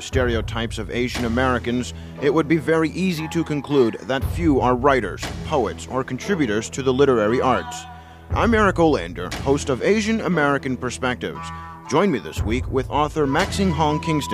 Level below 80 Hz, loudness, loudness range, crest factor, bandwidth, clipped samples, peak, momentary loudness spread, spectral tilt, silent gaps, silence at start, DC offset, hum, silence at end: -36 dBFS; -21 LUFS; 2 LU; 18 dB; 15.5 kHz; under 0.1%; -2 dBFS; 9 LU; -5.5 dB/octave; none; 0 s; under 0.1%; none; 0 s